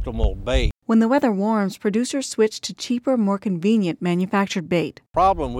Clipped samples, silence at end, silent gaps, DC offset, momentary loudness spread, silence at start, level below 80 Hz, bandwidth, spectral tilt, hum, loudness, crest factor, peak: under 0.1%; 0 s; none; under 0.1%; 6 LU; 0 s; -30 dBFS; 13.5 kHz; -6 dB/octave; none; -21 LUFS; 14 dB; -6 dBFS